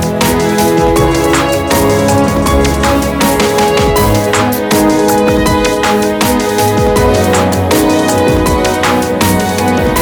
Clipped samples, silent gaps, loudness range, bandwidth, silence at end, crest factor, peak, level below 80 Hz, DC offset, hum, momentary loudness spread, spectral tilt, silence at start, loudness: under 0.1%; none; 0 LU; over 20 kHz; 0 s; 10 dB; 0 dBFS; -24 dBFS; under 0.1%; none; 2 LU; -4.5 dB/octave; 0 s; -10 LUFS